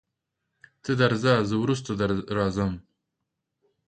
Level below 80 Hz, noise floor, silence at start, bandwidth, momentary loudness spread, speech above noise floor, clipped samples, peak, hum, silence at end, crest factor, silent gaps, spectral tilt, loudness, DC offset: -52 dBFS; -82 dBFS; 0.85 s; 9.2 kHz; 8 LU; 58 dB; under 0.1%; -8 dBFS; none; 1.1 s; 20 dB; none; -6.5 dB/octave; -25 LUFS; under 0.1%